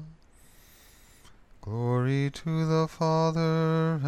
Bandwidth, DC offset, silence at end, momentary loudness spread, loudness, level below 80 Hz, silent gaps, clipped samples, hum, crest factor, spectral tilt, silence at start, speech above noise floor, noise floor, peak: 9.2 kHz; under 0.1%; 0 s; 6 LU; -27 LUFS; -58 dBFS; none; under 0.1%; none; 14 dB; -7.5 dB/octave; 0 s; 29 dB; -55 dBFS; -14 dBFS